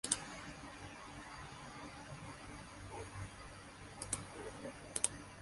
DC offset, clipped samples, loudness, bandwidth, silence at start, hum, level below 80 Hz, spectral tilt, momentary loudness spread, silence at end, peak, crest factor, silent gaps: under 0.1%; under 0.1%; -45 LUFS; 11.5 kHz; 0.05 s; none; -62 dBFS; -2.5 dB/octave; 13 LU; 0 s; -14 dBFS; 34 dB; none